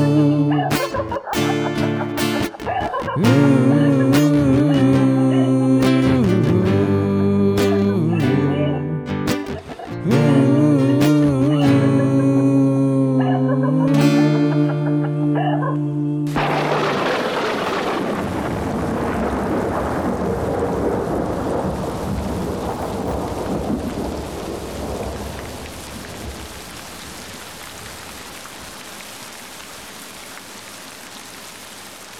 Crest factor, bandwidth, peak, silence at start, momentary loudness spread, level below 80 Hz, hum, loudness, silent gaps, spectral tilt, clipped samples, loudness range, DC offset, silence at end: 18 dB; over 20 kHz; 0 dBFS; 0 s; 18 LU; -40 dBFS; none; -18 LUFS; none; -7 dB/octave; under 0.1%; 17 LU; under 0.1%; 0 s